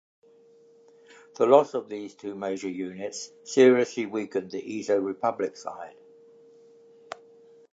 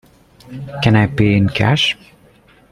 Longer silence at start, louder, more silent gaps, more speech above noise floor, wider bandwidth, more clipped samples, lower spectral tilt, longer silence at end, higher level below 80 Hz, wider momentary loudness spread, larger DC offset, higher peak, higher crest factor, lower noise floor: first, 1.4 s vs 0.5 s; second, -26 LUFS vs -14 LUFS; neither; about the same, 31 dB vs 34 dB; second, 8 kHz vs 10.5 kHz; neither; about the same, -5 dB/octave vs -6 dB/octave; first, 1.85 s vs 0.8 s; second, -78 dBFS vs -42 dBFS; first, 22 LU vs 17 LU; neither; second, -4 dBFS vs 0 dBFS; first, 24 dB vs 16 dB; first, -57 dBFS vs -49 dBFS